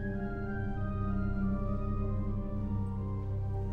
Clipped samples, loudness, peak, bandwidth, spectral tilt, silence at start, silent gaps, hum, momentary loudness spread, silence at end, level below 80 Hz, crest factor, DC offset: under 0.1%; -36 LUFS; -22 dBFS; 4.2 kHz; -11 dB/octave; 0 s; none; none; 3 LU; 0 s; -38 dBFS; 12 dB; under 0.1%